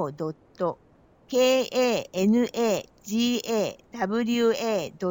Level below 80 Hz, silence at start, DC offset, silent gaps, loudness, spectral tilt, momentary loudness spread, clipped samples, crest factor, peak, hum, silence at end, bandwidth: -66 dBFS; 0 s; under 0.1%; none; -26 LUFS; -4.5 dB/octave; 9 LU; under 0.1%; 16 dB; -10 dBFS; none; 0 s; 17 kHz